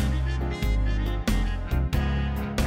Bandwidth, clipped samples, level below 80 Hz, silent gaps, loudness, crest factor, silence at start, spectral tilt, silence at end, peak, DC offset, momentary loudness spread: 16.5 kHz; under 0.1%; -26 dBFS; none; -27 LUFS; 12 dB; 0 s; -6 dB/octave; 0 s; -12 dBFS; under 0.1%; 2 LU